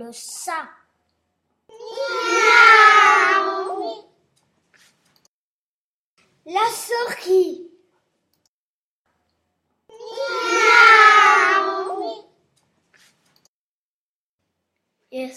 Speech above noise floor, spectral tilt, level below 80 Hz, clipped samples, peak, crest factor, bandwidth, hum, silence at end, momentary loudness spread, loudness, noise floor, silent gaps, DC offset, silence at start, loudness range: over 73 dB; 0 dB/octave; -80 dBFS; under 0.1%; 0 dBFS; 20 dB; 15.5 kHz; none; 0.05 s; 23 LU; -14 LUFS; under -90 dBFS; 5.28-6.17 s, 8.48-9.05 s, 13.48-14.38 s; under 0.1%; 0 s; 14 LU